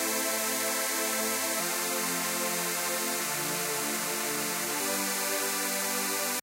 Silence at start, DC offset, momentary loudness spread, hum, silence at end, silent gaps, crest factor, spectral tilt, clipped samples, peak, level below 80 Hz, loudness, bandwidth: 0 s; under 0.1%; 2 LU; none; 0 s; none; 16 dB; -1 dB/octave; under 0.1%; -16 dBFS; -78 dBFS; -28 LUFS; 16 kHz